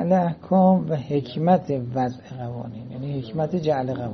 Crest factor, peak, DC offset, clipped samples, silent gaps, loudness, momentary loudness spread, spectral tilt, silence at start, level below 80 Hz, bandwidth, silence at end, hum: 18 dB; -4 dBFS; under 0.1%; under 0.1%; none; -23 LUFS; 15 LU; -9.5 dB/octave; 0 s; -58 dBFS; 6.2 kHz; 0 s; none